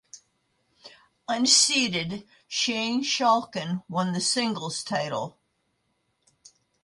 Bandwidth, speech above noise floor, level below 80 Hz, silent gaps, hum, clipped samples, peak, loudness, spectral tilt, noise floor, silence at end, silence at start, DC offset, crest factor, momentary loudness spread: 11.5 kHz; 48 dB; -70 dBFS; none; none; under 0.1%; -6 dBFS; -24 LUFS; -2.5 dB/octave; -74 dBFS; 1.55 s; 0.15 s; under 0.1%; 22 dB; 15 LU